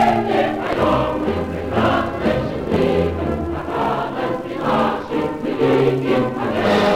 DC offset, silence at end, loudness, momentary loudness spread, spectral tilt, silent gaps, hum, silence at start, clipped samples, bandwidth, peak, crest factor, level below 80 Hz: under 0.1%; 0 s; -19 LUFS; 6 LU; -7 dB/octave; none; none; 0 s; under 0.1%; 16 kHz; -4 dBFS; 14 dB; -38 dBFS